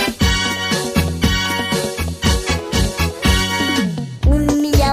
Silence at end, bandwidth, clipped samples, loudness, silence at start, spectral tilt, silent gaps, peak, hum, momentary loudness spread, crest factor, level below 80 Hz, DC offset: 0 s; 16 kHz; under 0.1%; -17 LUFS; 0 s; -4.5 dB/octave; none; -2 dBFS; none; 4 LU; 16 dB; -22 dBFS; under 0.1%